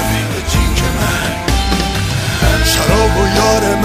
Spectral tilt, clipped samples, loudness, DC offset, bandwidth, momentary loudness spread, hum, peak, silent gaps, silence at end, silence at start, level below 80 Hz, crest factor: -4 dB/octave; under 0.1%; -13 LUFS; under 0.1%; 15.5 kHz; 5 LU; none; 0 dBFS; none; 0 s; 0 s; -20 dBFS; 12 dB